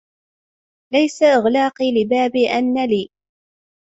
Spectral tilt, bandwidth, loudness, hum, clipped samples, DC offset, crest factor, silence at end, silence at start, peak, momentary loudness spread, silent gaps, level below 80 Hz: -5 dB/octave; 8 kHz; -17 LUFS; none; under 0.1%; under 0.1%; 16 dB; 0.9 s; 0.9 s; -4 dBFS; 6 LU; none; -62 dBFS